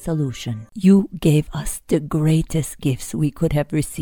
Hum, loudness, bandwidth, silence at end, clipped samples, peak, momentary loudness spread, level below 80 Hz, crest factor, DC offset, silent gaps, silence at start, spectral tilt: none; -20 LUFS; 18 kHz; 0 s; under 0.1%; -4 dBFS; 11 LU; -38 dBFS; 16 dB; under 0.1%; none; 0 s; -6.5 dB/octave